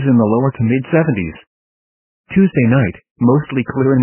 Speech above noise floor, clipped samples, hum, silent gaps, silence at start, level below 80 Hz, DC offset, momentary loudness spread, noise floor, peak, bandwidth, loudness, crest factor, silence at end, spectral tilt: over 76 dB; under 0.1%; none; 1.47-2.24 s, 3.10-3.16 s; 0 s; -42 dBFS; under 0.1%; 7 LU; under -90 dBFS; 0 dBFS; 3.2 kHz; -15 LUFS; 14 dB; 0 s; -12.5 dB/octave